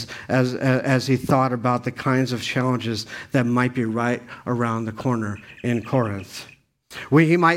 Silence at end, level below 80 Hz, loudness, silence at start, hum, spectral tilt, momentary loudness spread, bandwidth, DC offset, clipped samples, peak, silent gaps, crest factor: 0 s; -58 dBFS; -22 LUFS; 0 s; none; -6.5 dB/octave; 10 LU; 15.5 kHz; under 0.1%; under 0.1%; -4 dBFS; none; 18 dB